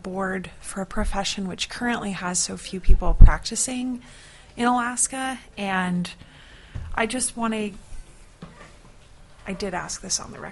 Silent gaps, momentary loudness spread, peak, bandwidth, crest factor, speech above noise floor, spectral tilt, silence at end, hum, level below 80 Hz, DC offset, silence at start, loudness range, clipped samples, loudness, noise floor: none; 19 LU; 0 dBFS; 11.5 kHz; 22 dB; 27 dB; -3.5 dB/octave; 0 s; none; -24 dBFS; under 0.1%; 0.05 s; 7 LU; under 0.1%; -25 LUFS; -48 dBFS